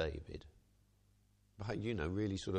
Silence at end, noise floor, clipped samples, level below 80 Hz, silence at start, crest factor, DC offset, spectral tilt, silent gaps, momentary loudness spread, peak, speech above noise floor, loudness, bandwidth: 0 s; -72 dBFS; under 0.1%; -56 dBFS; 0 s; 16 dB; under 0.1%; -6.5 dB/octave; none; 14 LU; -26 dBFS; 32 dB; -41 LUFS; 9.6 kHz